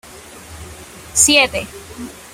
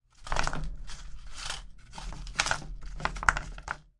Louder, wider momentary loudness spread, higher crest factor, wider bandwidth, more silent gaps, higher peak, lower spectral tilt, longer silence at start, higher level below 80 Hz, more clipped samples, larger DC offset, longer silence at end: first, -13 LUFS vs -33 LUFS; first, 25 LU vs 18 LU; second, 20 dB vs 30 dB; first, 16 kHz vs 11.5 kHz; neither; first, 0 dBFS vs -4 dBFS; about the same, -1 dB/octave vs -2 dB/octave; about the same, 0.15 s vs 0.2 s; about the same, -44 dBFS vs -40 dBFS; neither; neither; about the same, 0.2 s vs 0.1 s